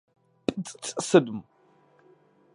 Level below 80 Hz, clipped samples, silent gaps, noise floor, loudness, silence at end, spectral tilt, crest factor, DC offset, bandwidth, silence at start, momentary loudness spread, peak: -68 dBFS; under 0.1%; none; -61 dBFS; -26 LUFS; 1.15 s; -5 dB/octave; 24 dB; under 0.1%; 11.5 kHz; 0.5 s; 14 LU; -4 dBFS